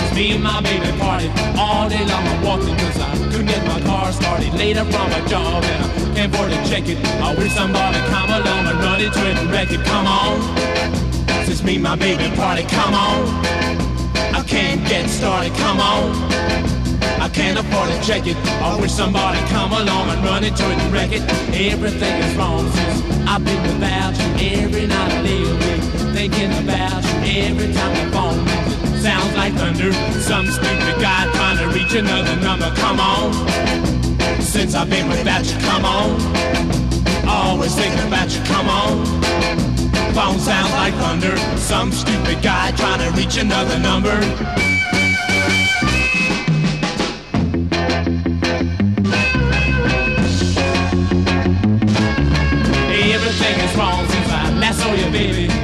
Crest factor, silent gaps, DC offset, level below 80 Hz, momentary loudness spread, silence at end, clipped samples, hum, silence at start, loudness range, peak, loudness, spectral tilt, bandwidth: 14 dB; none; 0.5%; -26 dBFS; 3 LU; 0 s; under 0.1%; none; 0 s; 2 LU; -2 dBFS; -17 LUFS; -5 dB/octave; 14 kHz